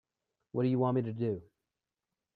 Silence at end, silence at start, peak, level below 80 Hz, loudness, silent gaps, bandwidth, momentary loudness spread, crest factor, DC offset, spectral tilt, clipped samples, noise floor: 0.95 s; 0.55 s; -18 dBFS; -74 dBFS; -33 LUFS; none; 4.6 kHz; 10 LU; 18 dB; under 0.1%; -11.5 dB/octave; under 0.1%; -90 dBFS